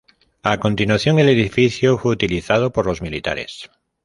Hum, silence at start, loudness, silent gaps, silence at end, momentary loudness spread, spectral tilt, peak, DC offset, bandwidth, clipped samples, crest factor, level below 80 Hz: none; 0.45 s; -18 LUFS; none; 0.4 s; 10 LU; -6 dB/octave; 0 dBFS; under 0.1%; 11.5 kHz; under 0.1%; 18 dB; -42 dBFS